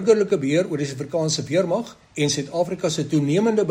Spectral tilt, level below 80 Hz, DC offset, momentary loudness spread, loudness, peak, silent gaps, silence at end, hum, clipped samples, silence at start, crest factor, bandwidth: -5 dB/octave; -60 dBFS; under 0.1%; 7 LU; -22 LUFS; -4 dBFS; none; 0 s; none; under 0.1%; 0 s; 16 dB; 15.5 kHz